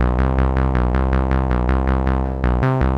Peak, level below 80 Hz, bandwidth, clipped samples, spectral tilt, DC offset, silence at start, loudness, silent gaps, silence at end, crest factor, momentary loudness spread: -6 dBFS; -20 dBFS; 4.8 kHz; under 0.1%; -9.5 dB/octave; under 0.1%; 0 s; -19 LUFS; none; 0 s; 12 dB; 2 LU